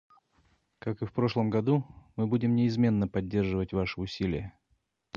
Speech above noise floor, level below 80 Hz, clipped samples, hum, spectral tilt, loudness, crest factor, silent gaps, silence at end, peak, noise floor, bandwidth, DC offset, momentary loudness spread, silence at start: 46 dB; -50 dBFS; under 0.1%; none; -8.5 dB/octave; -29 LUFS; 16 dB; none; 0.65 s; -12 dBFS; -74 dBFS; 7 kHz; under 0.1%; 11 LU; 0.85 s